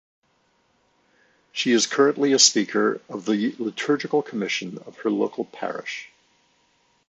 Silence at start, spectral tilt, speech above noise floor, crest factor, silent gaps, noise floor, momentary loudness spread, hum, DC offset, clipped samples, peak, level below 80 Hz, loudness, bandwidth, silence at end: 1.55 s; -2.5 dB/octave; 43 dB; 22 dB; none; -66 dBFS; 15 LU; none; under 0.1%; under 0.1%; -2 dBFS; -76 dBFS; -22 LUFS; 9.2 kHz; 1.05 s